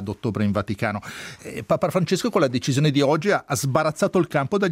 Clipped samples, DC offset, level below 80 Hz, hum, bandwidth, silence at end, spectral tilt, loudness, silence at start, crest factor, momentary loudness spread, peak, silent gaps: under 0.1%; under 0.1%; -58 dBFS; none; 16 kHz; 0 s; -5.5 dB/octave; -22 LUFS; 0 s; 18 dB; 11 LU; -4 dBFS; none